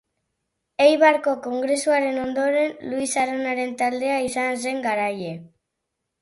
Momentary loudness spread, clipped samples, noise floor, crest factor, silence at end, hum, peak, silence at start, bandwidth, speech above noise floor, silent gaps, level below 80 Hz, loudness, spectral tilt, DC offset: 9 LU; under 0.1%; -80 dBFS; 18 dB; 0.75 s; none; -4 dBFS; 0.8 s; 11.5 kHz; 58 dB; none; -64 dBFS; -22 LUFS; -3.5 dB/octave; under 0.1%